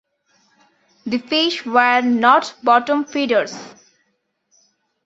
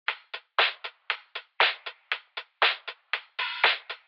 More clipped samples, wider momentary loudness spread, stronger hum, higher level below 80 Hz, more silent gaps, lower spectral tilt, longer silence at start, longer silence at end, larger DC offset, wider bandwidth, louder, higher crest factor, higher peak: neither; about the same, 12 LU vs 14 LU; neither; first, -68 dBFS vs under -90 dBFS; neither; first, -3.5 dB/octave vs -0.5 dB/octave; first, 1.05 s vs 0.1 s; first, 1.35 s vs 0.1 s; neither; second, 8 kHz vs 15 kHz; first, -17 LUFS vs -27 LUFS; about the same, 18 dB vs 22 dB; first, -2 dBFS vs -8 dBFS